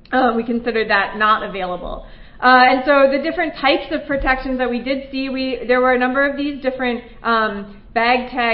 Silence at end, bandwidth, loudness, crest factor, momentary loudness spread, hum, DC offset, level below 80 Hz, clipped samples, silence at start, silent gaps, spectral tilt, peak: 0 s; 5.4 kHz; -17 LUFS; 18 dB; 11 LU; none; under 0.1%; -38 dBFS; under 0.1%; 0.1 s; none; -9.5 dB/octave; 0 dBFS